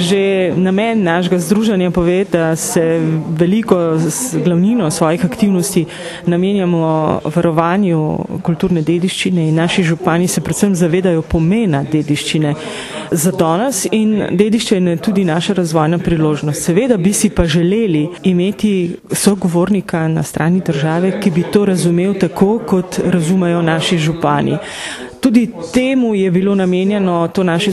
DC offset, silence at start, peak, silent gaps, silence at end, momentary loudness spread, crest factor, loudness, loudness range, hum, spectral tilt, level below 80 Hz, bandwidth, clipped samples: under 0.1%; 0 s; 0 dBFS; none; 0 s; 4 LU; 14 dB; -14 LUFS; 1 LU; none; -5.5 dB/octave; -38 dBFS; 13.5 kHz; under 0.1%